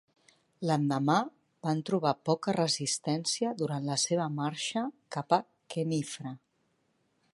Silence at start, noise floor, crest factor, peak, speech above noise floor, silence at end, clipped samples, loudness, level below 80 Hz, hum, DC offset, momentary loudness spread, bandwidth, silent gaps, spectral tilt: 0.6 s; -74 dBFS; 22 dB; -10 dBFS; 44 dB; 0.95 s; under 0.1%; -31 LUFS; -78 dBFS; none; under 0.1%; 10 LU; 11.5 kHz; none; -4.5 dB/octave